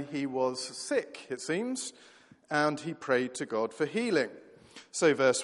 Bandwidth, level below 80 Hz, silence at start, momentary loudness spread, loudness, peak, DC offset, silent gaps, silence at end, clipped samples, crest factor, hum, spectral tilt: 11.5 kHz; -78 dBFS; 0 s; 10 LU; -31 LUFS; -12 dBFS; under 0.1%; none; 0 s; under 0.1%; 20 dB; none; -3.5 dB/octave